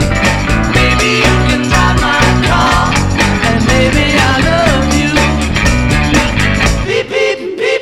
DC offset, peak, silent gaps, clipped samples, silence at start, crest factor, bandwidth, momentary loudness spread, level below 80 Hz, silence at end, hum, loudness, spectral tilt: 1%; 0 dBFS; none; under 0.1%; 0 s; 10 dB; 16 kHz; 3 LU; -18 dBFS; 0 s; none; -10 LUFS; -4.5 dB/octave